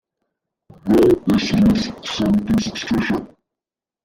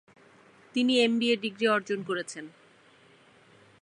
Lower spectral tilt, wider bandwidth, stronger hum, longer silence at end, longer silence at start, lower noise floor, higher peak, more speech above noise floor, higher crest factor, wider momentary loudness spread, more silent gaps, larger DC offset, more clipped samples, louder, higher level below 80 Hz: first, -6 dB/octave vs -4 dB/octave; first, 16 kHz vs 11 kHz; neither; second, 0.8 s vs 1.35 s; about the same, 0.85 s vs 0.75 s; first, -89 dBFS vs -59 dBFS; first, -4 dBFS vs -12 dBFS; first, 72 dB vs 32 dB; second, 14 dB vs 20 dB; second, 9 LU vs 16 LU; neither; neither; neither; first, -18 LUFS vs -27 LUFS; first, -40 dBFS vs -82 dBFS